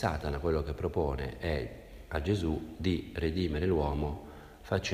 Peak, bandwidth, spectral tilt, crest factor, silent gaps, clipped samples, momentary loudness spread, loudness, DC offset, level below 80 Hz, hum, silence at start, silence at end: -14 dBFS; 15.5 kHz; -6.5 dB/octave; 18 dB; none; under 0.1%; 11 LU; -33 LUFS; under 0.1%; -42 dBFS; none; 0 s; 0 s